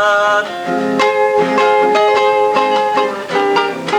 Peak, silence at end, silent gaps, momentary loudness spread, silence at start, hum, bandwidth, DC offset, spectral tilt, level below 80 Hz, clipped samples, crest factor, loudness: -2 dBFS; 0 s; none; 5 LU; 0 s; none; 14 kHz; under 0.1%; -4 dB/octave; -62 dBFS; under 0.1%; 10 dB; -13 LUFS